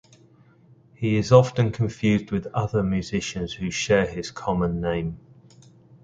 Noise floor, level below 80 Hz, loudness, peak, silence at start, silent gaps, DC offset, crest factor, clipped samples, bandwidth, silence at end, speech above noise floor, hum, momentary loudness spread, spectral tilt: -55 dBFS; -46 dBFS; -23 LUFS; 0 dBFS; 1 s; none; under 0.1%; 24 dB; under 0.1%; 8.8 kHz; 0.85 s; 32 dB; none; 12 LU; -6 dB/octave